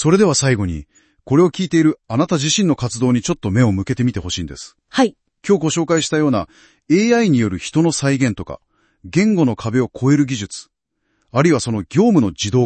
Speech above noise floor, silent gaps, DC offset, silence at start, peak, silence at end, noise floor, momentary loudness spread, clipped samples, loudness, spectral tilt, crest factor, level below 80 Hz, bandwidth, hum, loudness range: 52 dB; none; under 0.1%; 0 s; 0 dBFS; 0 s; -69 dBFS; 11 LU; under 0.1%; -17 LUFS; -5.5 dB/octave; 16 dB; -48 dBFS; 8.8 kHz; none; 2 LU